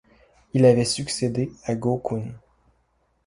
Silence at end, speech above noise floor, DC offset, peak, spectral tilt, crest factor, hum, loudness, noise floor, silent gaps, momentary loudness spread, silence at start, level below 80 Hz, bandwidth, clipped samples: 0.9 s; 46 dB; under 0.1%; -4 dBFS; -5.5 dB/octave; 20 dB; none; -23 LUFS; -67 dBFS; none; 12 LU; 0.55 s; -56 dBFS; 11.5 kHz; under 0.1%